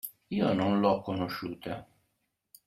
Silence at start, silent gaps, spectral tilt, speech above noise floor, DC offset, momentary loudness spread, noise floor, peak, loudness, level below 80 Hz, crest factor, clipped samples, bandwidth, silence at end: 0.05 s; none; -6.5 dB/octave; 50 dB; under 0.1%; 14 LU; -79 dBFS; -12 dBFS; -30 LUFS; -66 dBFS; 20 dB; under 0.1%; 16 kHz; 0.8 s